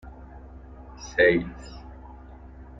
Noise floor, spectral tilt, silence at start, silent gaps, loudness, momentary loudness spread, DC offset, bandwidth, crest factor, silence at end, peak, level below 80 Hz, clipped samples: -44 dBFS; -5.5 dB/octave; 0.05 s; none; -22 LUFS; 26 LU; under 0.1%; 7.8 kHz; 22 dB; 0.15 s; -8 dBFS; -44 dBFS; under 0.1%